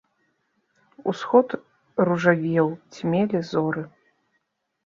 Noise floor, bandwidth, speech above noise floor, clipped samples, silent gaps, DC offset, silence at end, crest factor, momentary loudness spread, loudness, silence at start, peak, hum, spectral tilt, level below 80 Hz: -75 dBFS; 7.4 kHz; 53 dB; under 0.1%; none; under 0.1%; 0.95 s; 20 dB; 11 LU; -23 LUFS; 1.05 s; -4 dBFS; none; -7.5 dB/octave; -68 dBFS